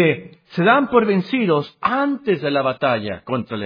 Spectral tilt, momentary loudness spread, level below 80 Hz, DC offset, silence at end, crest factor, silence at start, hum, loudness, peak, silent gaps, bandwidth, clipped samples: -8.5 dB/octave; 10 LU; -58 dBFS; under 0.1%; 0 s; 18 dB; 0 s; none; -19 LUFS; 0 dBFS; none; 5.2 kHz; under 0.1%